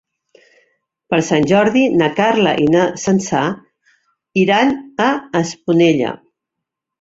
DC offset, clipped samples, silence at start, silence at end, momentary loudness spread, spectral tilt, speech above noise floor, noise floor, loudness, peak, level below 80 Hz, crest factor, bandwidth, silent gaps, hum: under 0.1%; under 0.1%; 1.1 s; 0.85 s; 8 LU; -5.5 dB/octave; 66 dB; -81 dBFS; -15 LUFS; -2 dBFS; -54 dBFS; 16 dB; 7.8 kHz; none; none